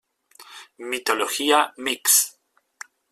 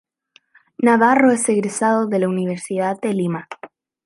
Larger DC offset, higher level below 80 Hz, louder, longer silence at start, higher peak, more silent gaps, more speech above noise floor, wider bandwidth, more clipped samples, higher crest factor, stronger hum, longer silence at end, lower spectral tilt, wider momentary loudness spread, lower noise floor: neither; second, -74 dBFS vs -68 dBFS; about the same, -20 LUFS vs -18 LUFS; second, 0.4 s vs 0.8 s; about the same, -4 dBFS vs -2 dBFS; neither; second, 28 dB vs 40 dB; first, 16 kHz vs 11.5 kHz; neither; about the same, 20 dB vs 18 dB; neither; first, 0.8 s vs 0.4 s; second, 1 dB/octave vs -5.5 dB/octave; first, 26 LU vs 11 LU; second, -50 dBFS vs -57 dBFS